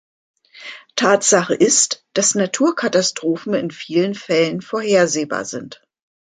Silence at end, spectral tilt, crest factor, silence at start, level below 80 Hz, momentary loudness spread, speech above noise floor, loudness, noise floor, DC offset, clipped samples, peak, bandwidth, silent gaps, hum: 0.5 s; -3 dB/octave; 18 dB; 0.55 s; -66 dBFS; 14 LU; 20 dB; -17 LUFS; -38 dBFS; under 0.1%; under 0.1%; -2 dBFS; 9.6 kHz; none; none